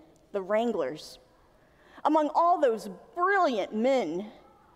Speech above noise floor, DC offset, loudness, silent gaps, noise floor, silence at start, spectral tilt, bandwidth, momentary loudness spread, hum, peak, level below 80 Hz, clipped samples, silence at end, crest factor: 34 dB; under 0.1%; -27 LUFS; none; -61 dBFS; 0.35 s; -5 dB/octave; 15 kHz; 15 LU; none; -12 dBFS; -70 dBFS; under 0.1%; 0.45 s; 16 dB